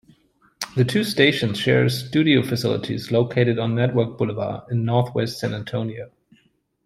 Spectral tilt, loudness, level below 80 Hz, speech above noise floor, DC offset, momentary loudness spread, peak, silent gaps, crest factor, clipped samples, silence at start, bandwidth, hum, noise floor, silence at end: -6 dB/octave; -21 LUFS; -58 dBFS; 43 dB; under 0.1%; 10 LU; -2 dBFS; none; 18 dB; under 0.1%; 0.6 s; 15 kHz; none; -63 dBFS; 0.8 s